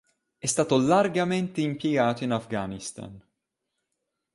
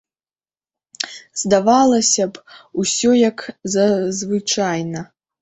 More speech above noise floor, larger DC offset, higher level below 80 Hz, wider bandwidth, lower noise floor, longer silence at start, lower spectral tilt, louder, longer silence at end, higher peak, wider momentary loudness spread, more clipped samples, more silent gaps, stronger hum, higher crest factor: second, 57 dB vs over 73 dB; neither; about the same, -62 dBFS vs -58 dBFS; first, 11.5 kHz vs 8.4 kHz; second, -82 dBFS vs under -90 dBFS; second, 0.45 s vs 1 s; first, -5 dB/octave vs -3.5 dB/octave; second, -25 LUFS vs -17 LUFS; first, 1.15 s vs 0.35 s; second, -8 dBFS vs 0 dBFS; about the same, 15 LU vs 14 LU; neither; neither; neither; about the same, 20 dB vs 18 dB